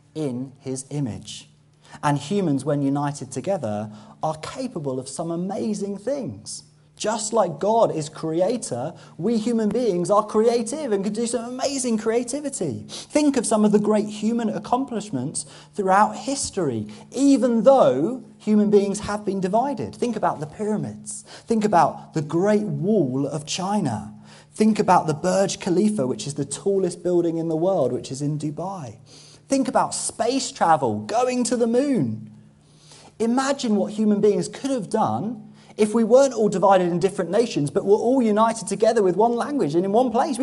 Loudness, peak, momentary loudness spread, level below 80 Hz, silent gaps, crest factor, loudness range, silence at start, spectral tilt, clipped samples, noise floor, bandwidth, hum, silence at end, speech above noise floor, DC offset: -22 LUFS; -2 dBFS; 11 LU; -60 dBFS; none; 20 dB; 6 LU; 0.15 s; -5.5 dB/octave; under 0.1%; -51 dBFS; 11.5 kHz; none; 0 s; 30 dB; under 0.1%